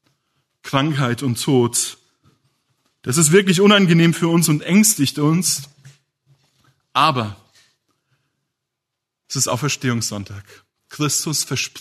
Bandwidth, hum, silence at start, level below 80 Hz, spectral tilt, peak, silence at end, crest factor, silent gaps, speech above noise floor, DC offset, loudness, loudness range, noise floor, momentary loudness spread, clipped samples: 13.5 kHz; none; 0.65 s; -62 dBFS; -4 dB/octave; 0 dBFS; 0 s; 20 dB; none; 64 dB; under 0.1%; -17 LUFS; 10 LU; -81 dBFS; 13 LU; under 0.1%